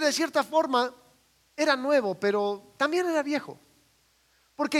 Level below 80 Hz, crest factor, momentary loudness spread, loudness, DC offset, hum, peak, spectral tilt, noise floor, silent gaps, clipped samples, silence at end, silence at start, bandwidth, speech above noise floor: -76 dBFS; 18 dB; 8 LU; -27 LUFS; under 0.1%; none; -10 dBFS; -3 dB/octave; -66 dBFS; none; under 0.1%; 0 s; 0 s; 16 kHz; 40 dB